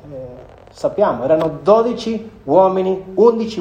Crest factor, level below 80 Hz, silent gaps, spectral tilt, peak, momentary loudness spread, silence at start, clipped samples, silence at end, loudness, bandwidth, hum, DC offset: 16 dB; -50 dBFS; none; -7 dB/octave; 0 dBFS; 13 LU; 0.05 s; under 0.1%; 0 s; -16 LUFS; 9.4 kHz; none; under 0.1%